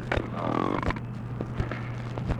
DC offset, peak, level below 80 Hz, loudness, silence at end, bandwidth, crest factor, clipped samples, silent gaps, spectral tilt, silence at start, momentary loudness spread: under 0.1%; -10 dBFS; -40 dBFS; -31 LUFS; 0 s; 9.6 kHz; 20 dB; under 0.1%; none; -7.5 dB/octave; 0 s; 7 LU